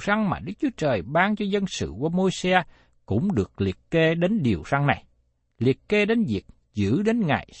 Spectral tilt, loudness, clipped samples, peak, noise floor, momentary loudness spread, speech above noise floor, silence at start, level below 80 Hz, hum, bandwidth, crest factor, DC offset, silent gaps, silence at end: -6.5 dB/octave; -24 LUFS; under 0.1%; -4 dBFS; -66 dBFS; 7 LU; 43 dB; 0 s; -50 dBFS; none; 8.8 kHz; 20 dB; under 0.1%; none; 0 s